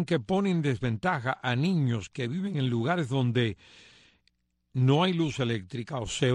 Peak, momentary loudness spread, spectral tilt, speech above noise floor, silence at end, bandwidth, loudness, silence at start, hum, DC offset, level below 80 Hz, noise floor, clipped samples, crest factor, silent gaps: -10 dBFS; 9 LU; -6.5 dB/octave; 45 dB; 0 s; 10 kHz; -28 LUFS; 0 s; none; under 0.1%; -58 dBFS; -72 dBFS; under 0.1%; 18 dB; none